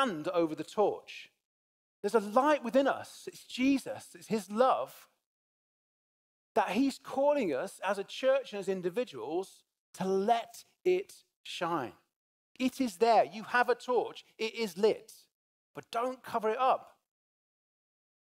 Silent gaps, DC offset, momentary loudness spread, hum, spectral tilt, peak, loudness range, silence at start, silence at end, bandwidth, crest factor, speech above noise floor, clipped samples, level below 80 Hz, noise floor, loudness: 1.45-2.03 s, 5.26-6.55 s, 9.79-9.93 s, 11.36-11.44 s, 12.16-12.55 s, 15.34-15.74 s; under 0.1%; 15 LU; none; -4.5 dB/octave; -12 dBFS; 3 LU; 0 s; 1.45 s; 16 kHz; 20 dB; over 59 dB; under 0.1%; -78 dBFS; under -90 dBFS; -32 LUFS